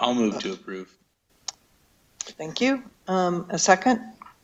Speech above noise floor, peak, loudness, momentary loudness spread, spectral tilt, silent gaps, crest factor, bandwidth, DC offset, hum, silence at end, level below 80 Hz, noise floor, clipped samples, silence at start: 38 dB; -2 dBFS; -24 LUFS; 17 LU; -3.5 dB/octave; none; 24 dB; 8.4 kHz; under 0.1%; none; 0.15 s; -66 dBFS; -62 dBFS; under 0.1%; 0 s